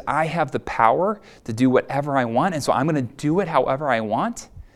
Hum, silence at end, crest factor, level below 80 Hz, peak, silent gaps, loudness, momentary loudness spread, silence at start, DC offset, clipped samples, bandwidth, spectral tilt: none; 0.15 s; 20 dB; -50 dBFS; 0 dBFS; none; -21 LUFS; 6 LU; 0 s; under 0.1%; under 0.1%; 13.5 kHz; -6 dB/octave